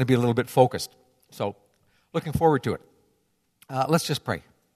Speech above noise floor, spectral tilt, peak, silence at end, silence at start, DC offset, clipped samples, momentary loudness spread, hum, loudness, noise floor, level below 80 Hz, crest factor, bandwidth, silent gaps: 47 dB; -6 dB/octave; -4 dBFS; 0.35 s; 0 s; under 0.1%; under 0.1%; 12 LU; none; -25 LUFS; -71 dBFS; -54 dBFS; 22 dB; 14 kHz; none